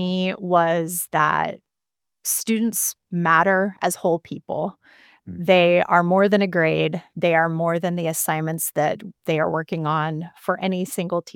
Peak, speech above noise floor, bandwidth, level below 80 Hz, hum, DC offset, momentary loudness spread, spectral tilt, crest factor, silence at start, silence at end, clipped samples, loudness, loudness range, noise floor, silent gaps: -2 dBFS; 66 dB; 18.5 kHz; -68 dBFS; none; under 0.1%; 11 LU; -4.5 dB/octave; 20 dB; 0 s; 0.05 s; under 0.1%; -21 LUFS; 4 LU; -87 dBFS; none